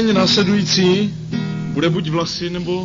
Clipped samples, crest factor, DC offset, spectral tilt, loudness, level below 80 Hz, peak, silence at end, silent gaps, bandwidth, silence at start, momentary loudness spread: under 0.1%; 14 dB; under 0.1%; -5 dB/octave; -17 LUFS; -46 dBFS; -4 dBFS; 0 s; none; 7.6 kHz; 0 s; 9 LU